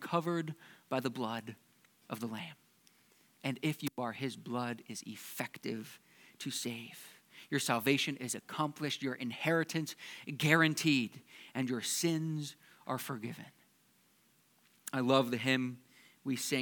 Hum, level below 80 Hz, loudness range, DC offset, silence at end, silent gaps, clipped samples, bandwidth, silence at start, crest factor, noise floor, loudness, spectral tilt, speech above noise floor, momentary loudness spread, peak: none; -90 dBFS; 8 LU; under 0.1%; 0 s; none; under 0.1%; 19 kHz; 0 s; 26 dB; -70 dBFS; -36 LUFS; -4 dB/octave; 34 dB; 19 LU; -12 dBFS